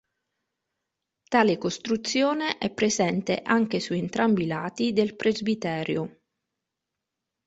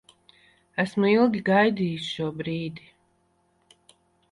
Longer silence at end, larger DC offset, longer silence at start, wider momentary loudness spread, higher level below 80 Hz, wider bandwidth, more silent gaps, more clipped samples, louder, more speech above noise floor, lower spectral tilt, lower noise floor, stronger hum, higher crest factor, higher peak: second, 1.35 s vs 1.55 s; neither; first, 1.3 s vs 0.75 s; second, 6 LU vs 13 LU; about the same, -64 dBFS vs -64 dBFS; second, 8 kHz vs 11.5 kHz; neither; neither; about the same, -25 LUFS vs -24 LUFS; first, 60 dB vs 44 dB; second, -4.5 dB/octave vs -6.5 dB/octave; first, -85 dBFS vs -68 dBFS; neither; about the same, 22 dB vs 18 dB; about the same, -6 dBFS vs -8 dBFS